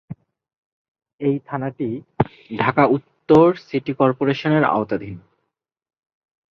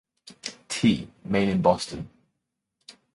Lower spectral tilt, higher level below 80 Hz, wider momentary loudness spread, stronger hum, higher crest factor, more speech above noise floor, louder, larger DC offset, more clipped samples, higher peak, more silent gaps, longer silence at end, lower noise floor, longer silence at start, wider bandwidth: first, -8.5 dB/octave vs -5.5 dB/octave; about the same, -54 dBFS vs -54 dBFS; second, 13 LU vs 16 LU; neither; about the same, 20 dB vs 22 dB; about the same, 59 dB vs 58 dB; first, -20 LUFS vs -25 LUFS; neither; neither; first, 0 dBFS vs -6 dBFS; first, 0.57-0.95 s, 1.13-1.18 s vs none; first, 1.3 s vs 0.25 s; about the same, -78 dBFS vs -81 dBFS; second, 0.1 s vs 0.25 s; second, 6.8 kHz vs 11.5 kHz